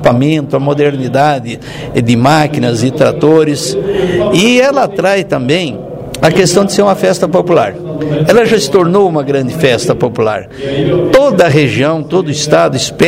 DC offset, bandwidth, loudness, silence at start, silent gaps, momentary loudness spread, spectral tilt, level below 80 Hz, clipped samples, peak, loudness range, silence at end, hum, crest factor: under 0.1%; 16.5 kHz; -10 LUFS; 0 s; none; 7 LU; -5.5 dB/octave; -40 dBFS; 0.6%; 0 dBFS; 1 LU; 0 s; none; 10 dB